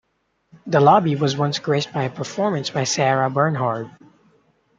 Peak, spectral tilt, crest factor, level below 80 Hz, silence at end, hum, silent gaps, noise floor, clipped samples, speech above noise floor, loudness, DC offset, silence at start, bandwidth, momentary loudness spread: -2 dBFS; -5 dB/octave; 20 dB; -64 dBFS; 0.9 s; none; none; -66 dBFS; under 0.1%; 47 dB; -20 LUFS; under 0.1%; 0.65 s; 8.6 kHz; 11 LU